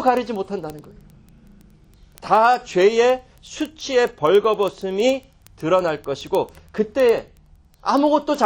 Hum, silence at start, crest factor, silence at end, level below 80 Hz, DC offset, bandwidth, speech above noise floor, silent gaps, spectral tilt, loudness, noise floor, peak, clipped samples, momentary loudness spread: none; 0 s; 18 dB; 0 s; -52 dBFS; under 0.1%; 17 kHz; 32 dB; none; -5 dB/octave; -20 LUFS; -51 dBFS; -2 dBFS; under 0.1%; 13 LU